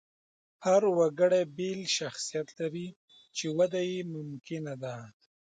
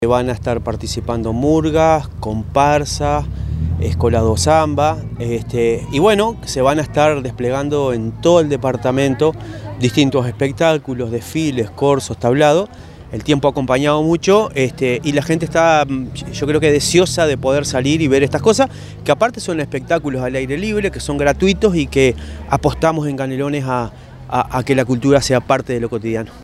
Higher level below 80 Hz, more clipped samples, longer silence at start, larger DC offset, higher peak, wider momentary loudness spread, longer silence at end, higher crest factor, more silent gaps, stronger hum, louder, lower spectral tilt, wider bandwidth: second, -78 dBFS vs -36 dBFS; neither; first, 0.6 s vs 0 s; neither; second, -14 dBFS vs 0 dBFS; first, 15 LU vs 8 LU; first, 0.5 s vs 0 s; about the same, 18 dB vs 16 dB; first, 2.96-3.08 s vs none; neither; second, -30 LUFS vs -16 LUFS; about the same, -4.5 dB/octave vs -5.5 dB/octave; second, 9.4 kHz vs 15 kHz